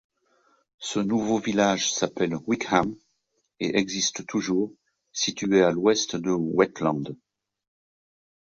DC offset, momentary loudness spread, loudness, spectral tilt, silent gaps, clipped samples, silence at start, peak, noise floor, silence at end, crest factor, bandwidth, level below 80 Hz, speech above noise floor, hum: under 0.1%; 11 LU; -25 LUFS; -4 dB/octave; none; under 0.1%; 0.8 s; -6 dBFS; -74 dBFS; 1.4 s; 20 dB; 8 kHz; -62 dBFS; 50 dB; none